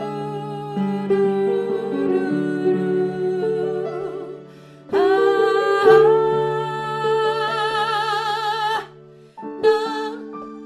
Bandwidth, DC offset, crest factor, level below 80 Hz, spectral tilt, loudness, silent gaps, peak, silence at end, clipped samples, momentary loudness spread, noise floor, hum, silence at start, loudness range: 11 kHz; under 0.1%; 18 dB; -64 dBFS; -6 dB/octave; -20 LUFS; none; -2 dBFS; 0 s; under 0.1%; 13 LU; -45 dBFS; none; 0 s; 5 LU